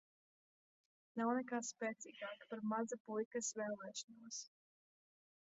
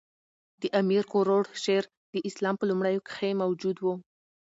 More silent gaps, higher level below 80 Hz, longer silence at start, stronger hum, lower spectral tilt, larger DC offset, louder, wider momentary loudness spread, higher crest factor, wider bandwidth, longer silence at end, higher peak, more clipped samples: about the same, 3.00-3.05 s, 3.25-3.31 s, 4.04-4.08 s vs 1.97-2.13 s; second, under -90 dBFS vs -78 dBFS; first, 1.15 s vs 0.6 s; neither; second, -3.5 dB/octave vs -6 dB/octave; neither; second, -44 LUFS vs -28 LUFS; about the same, 10 LU vs 9 LU; about the same, 20 dB vs 16 dB; about the same, 8 kHz vs 8 kHz; first, 1.1 s vs 0.6 s; second, -26 dBFS vs -12 dBFS; neither